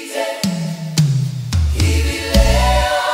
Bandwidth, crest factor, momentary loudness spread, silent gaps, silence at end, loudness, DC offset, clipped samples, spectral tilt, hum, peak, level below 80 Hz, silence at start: 16 kHz; 14 dB; 6 LU; none; 0 s; -17 LUFS; under 0.1%; under 0.1%; -5 dB/octave; none; 0 dBFS; -20 dBFS; 0 s